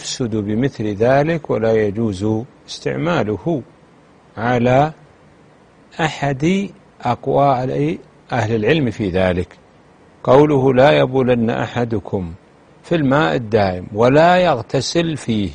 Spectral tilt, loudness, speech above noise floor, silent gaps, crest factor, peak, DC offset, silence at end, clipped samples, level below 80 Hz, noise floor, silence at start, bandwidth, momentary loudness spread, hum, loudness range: -6.5 dB/octave; -17 LUFS; 32 dB; none; 18 dB; 0 dBFS; under 0.1%; 0 s; under 0.1%; -46 dBFS; -48 dBFS; 0 s; 10 kHz; 12 LU; none; 5 LU